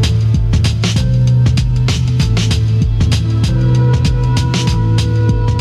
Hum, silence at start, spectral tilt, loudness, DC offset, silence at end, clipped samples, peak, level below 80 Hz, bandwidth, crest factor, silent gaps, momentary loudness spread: none; 0 s; -6 dB/octave; -13 LUFS; under 0.1%; 0 s; under 0.1%; -2 dBFS; -20 dBFS; 11.5 kHz; 10 dB; none; 2 LU